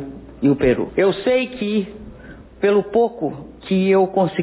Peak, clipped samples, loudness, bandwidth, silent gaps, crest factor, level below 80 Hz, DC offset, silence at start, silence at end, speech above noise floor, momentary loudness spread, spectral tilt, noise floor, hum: -4 dBFS; under 0.1%; -19 LUFS; 4 kHz; none; 14 dB; -44 dBFS; under 0.1%; 0 s; 0 s; 22 dB; 17 LU; -11 dB/octave; -40 dBFS; none